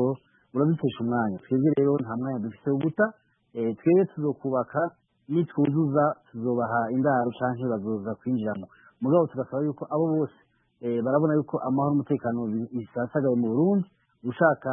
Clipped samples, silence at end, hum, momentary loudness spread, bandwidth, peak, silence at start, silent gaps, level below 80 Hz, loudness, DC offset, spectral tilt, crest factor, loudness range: under 0.1%; 0 s; none; 9 LU; 3.6 kHz; -8 dBFS; 0 s; none; -70 dBFS; -26 LUFS; under 0.1%; -12.5 dB/octave; 18 dB; 2 LU